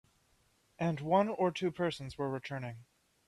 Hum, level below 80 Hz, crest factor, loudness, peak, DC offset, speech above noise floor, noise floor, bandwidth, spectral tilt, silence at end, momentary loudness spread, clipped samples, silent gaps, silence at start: none; -68 dBFS; 20 dB; -34 LUFS; -16 dBFS; under 0.1%; 38 dB; -72 dBFS; 12.5 kHz; -7 dB/octave; 0.45 s; 12 LU; under 0.1%; none; 0.8 s